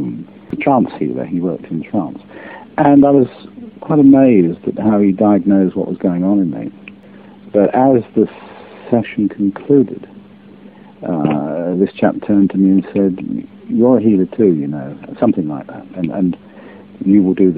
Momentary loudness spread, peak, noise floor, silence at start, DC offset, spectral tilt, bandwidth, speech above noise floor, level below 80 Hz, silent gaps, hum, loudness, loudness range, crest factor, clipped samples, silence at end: 17 LU; 0 dBFS; -39 dBFS; 0 s; 0.1%; -12.5 dB/octave; 4 kHz; 26 dB; -52 dBFS; none; none; -14 LUFS; 5 LU; 14 dB; under 0.1%; 0 s